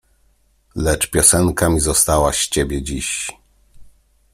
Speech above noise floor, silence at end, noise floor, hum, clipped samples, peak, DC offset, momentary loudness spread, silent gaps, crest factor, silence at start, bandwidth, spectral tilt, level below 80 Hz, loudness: 41 dB; 0.45 s; -58 dBFS; none; under 0.1%; 0 dBFS; under 0.1%; 11 LU; none; 20 dB; 0.75 s; 16 kHz; -3.5 dB/octave; -32 dBFS; -16 LUFS